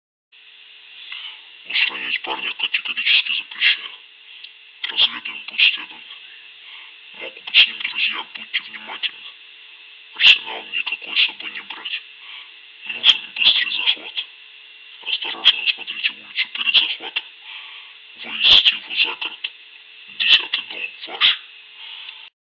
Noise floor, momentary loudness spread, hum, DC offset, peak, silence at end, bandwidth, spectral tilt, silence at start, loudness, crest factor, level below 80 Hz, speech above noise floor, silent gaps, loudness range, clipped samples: -45 dBFS; 24 LU; none; under 0.1%; 0 dBFS; 0.15 s; 7.6 kHz; 0 dB/octave; 0.9 s; -17 LUFS; 22 dB; -64 dBFS; 25 dB; none; 4 LU; under 0.1%